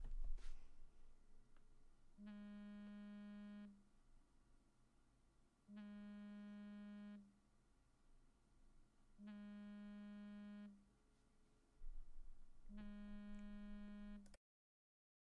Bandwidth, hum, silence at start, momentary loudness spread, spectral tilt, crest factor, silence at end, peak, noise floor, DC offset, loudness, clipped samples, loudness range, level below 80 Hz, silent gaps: 9.6 kHz; none; 0 s; 7 LU; -7 dB/octave; 20 dB; 1 s; -36 dBFS; -76 dBFS; under 0.1%; -59 LUFS; under 0.1%; 2 LU; -60 dBFS; none